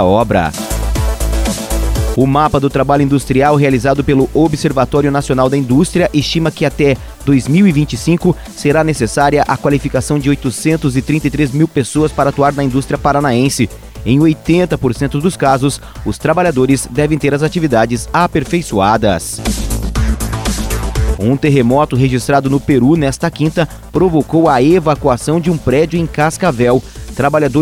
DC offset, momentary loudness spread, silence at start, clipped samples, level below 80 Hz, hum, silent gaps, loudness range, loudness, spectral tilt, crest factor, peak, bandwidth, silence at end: under 0.1%; 6 LU; 0 s; under 0.1%; -24 dBFS; none; none; 2 LU; -13 LUFS; -6 dB/octave; 12 dB; 0 dBFS; 16.5 kHz; 0 s